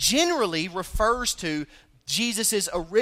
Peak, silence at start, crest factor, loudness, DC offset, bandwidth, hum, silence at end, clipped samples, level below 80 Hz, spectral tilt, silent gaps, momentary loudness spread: -8 dBFS; 0 s; 16 dB; -24 LUFS; under 0.1%; 16 kHz; none; 0 s; under 0.1%; -40 dBFS; -2 dB/octave; none; 10 LU